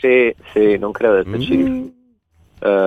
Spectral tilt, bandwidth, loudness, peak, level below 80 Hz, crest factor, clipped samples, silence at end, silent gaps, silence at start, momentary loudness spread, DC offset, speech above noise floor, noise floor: -7.5 dB/octave; 6.4 kHz; -17 LUFS; -2 dBFS; -46 dBFS; 14 dB; under 0.1%; 0 s; none; 0.05 s; 8 LU; under 0.1%; 40 dB; -55 dBFS